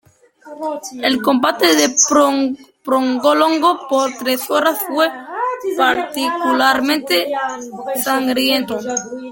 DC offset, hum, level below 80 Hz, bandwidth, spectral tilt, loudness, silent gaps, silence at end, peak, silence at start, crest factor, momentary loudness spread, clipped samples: under 0.1%; none; -62 dBFS; 17 kHz; -1.5 dB/octave; -16 LUFS; none; 0 s; 0 dBFS; 0.45 s; 16 dB; 11 LU; under 0.1%